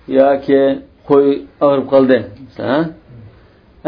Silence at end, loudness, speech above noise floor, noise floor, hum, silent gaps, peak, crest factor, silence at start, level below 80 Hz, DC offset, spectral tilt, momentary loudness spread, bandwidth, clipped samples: 0 s; -14 LUFS; 33 dB; -46 dBFS; none; none; 0 dBFS; 14 dB; 0.1 s; -50 dBFS; under 0.1%; -9.5 dB/octave; 13 LU; 5.2 kHz; 0.1%